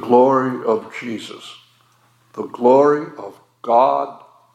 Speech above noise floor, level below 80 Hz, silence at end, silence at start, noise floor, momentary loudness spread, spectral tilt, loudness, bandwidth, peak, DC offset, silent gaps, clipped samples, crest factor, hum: 40 dB; -80 dBFS; 0.4 s; 0 s; -57 dBFS; 23 LU; -6.5 dB/octave; -17 LUFS; 10 kHz; 0 dBFS; under 0.1%; none; under 0.1%; 18 dB; none